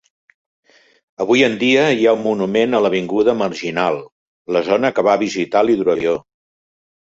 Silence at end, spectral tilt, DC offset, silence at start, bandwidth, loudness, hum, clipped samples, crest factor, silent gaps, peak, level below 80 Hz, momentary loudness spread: 0.9 s; -5 dB/octave; under 0.1%; 1.2 s; 7.8 kHz; -16 LUFS; none; under 0.1%; 16 dB; 4.12-4.45 s; -2 dBFS; -58 dBFS; 7 LU